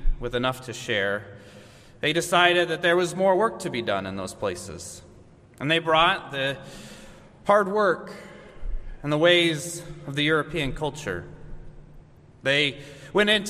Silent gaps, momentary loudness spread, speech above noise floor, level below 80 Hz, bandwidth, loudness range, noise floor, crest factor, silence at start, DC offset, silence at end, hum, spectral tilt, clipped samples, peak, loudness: none; 21 LU; 26 dB; -38 dBFS; 15 kHz; 3 LU; -51 dBFS; 22 dB; 0 s; under 0.1%; 0 s; none; -4 dB/octave; under 0.1%; -4 dBFS; -24 LUFS